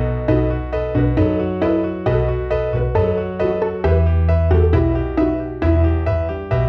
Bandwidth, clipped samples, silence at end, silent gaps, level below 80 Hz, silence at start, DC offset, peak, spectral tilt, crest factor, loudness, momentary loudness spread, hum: 5 kHz; under 0.1%; 0 s; none; -24 dBFS; 0 s; under 0.1%; -4 dBFS; -10.5 dB/octave; 12 dB; -18 LUFS; 5 LU; none